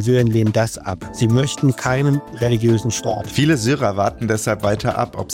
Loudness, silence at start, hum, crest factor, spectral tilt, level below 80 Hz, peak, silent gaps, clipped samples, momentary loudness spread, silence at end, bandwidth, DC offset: -18 LUFS; 0 s; none; 14 dB; -6 dB/octave; -44 dBFS; -4 dBFS; none; under 0.1%; 6 LU; 0 s; 16.5 kHz; under 0.1%